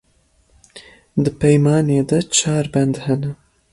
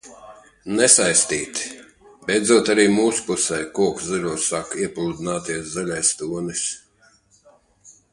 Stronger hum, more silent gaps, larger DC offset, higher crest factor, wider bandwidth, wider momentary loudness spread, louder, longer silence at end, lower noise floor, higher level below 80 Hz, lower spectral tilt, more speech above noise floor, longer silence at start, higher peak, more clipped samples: neither; neither; neither; second, 16 dB vs 22 dB; about the same, 11.5 kHz vs 11.5 kHz; second, 8 LU vs 13 LU; first, -17 LUFS vs -20 LUFS; first, 0.4 s vs 0.2 s; about the same, -59 dBFS vs -57 dBFS; first, -48 dBFS vs -56 dBFS; first, -5.5 dB/octave vs -2.5 dB/octave; first, 42 dB vs 37 dB; first, 0.75 s vs 0.05 s; about the same, -2 dBFS vs 0 dBFS; neither